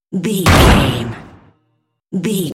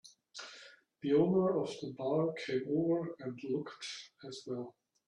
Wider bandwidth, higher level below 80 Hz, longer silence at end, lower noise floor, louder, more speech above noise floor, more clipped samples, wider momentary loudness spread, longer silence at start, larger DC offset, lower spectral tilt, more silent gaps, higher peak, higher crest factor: first, 17 kHz vs 10.5 kHz; first, -22 dBFS vs -78 dBFS; second, 0 s vs 0.35 s; first, -66 dBFS vs -58 dBFS; first, -13 LUFS vs -35 LUFS; first, 53 dB vs 23 dB; neither; about the same, 17 LU vs 18 LU; about the same, 0.1 s vs 0.05 s; neither; second, -5 dB/octave vs -6.5 dB/octave; neither; first, 0 dBFS vs -18 dBFS; about the same, 16 dB vs 18 dB